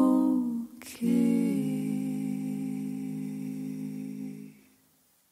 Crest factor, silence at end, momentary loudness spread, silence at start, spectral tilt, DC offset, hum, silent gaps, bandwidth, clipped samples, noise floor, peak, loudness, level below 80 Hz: 16 dB; 0.8 s; 14 LU; 0 s; -7.5 dB/octave; under 0.1%; none; none; 15.5 kHz; under 0.1%; -66 dBFS; -14 dBFS; -31 LUFS; -74 dBFS